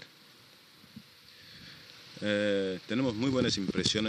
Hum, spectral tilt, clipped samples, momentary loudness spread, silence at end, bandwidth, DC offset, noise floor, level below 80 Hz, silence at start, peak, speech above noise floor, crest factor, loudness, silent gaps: none; -4.5 dB/octave; under 0.1%; 23 LU; 0 s; 15 kHz; under 0.1%; -57 dBFS; -62 dBFS; 0 s; -14 dBFS; 27 dB; 18 dB; -30 LUFS; none